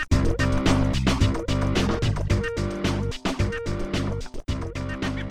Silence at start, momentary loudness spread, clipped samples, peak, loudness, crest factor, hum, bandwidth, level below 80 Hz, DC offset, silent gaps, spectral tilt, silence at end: 0 s; 9 LU; under 0.1%; -8 dBFS; -25 LUFS; 16 dB; none; 13 kHz; -30 dBFS; under 0.1%; none; -6 dB/octave; 0 s